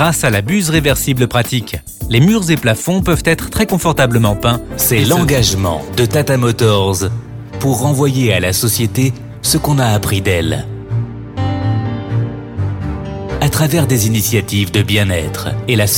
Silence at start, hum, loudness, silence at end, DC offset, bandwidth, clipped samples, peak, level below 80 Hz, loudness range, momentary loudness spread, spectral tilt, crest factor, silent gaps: 0 s; none; -14 LUFS; 0 s; under 0.1%; 19.5 kHz; under 0.1%; 0 dBFS; -32 dBFS; 4 LU; 9 LU; -5 dB/octave; 14 dB; none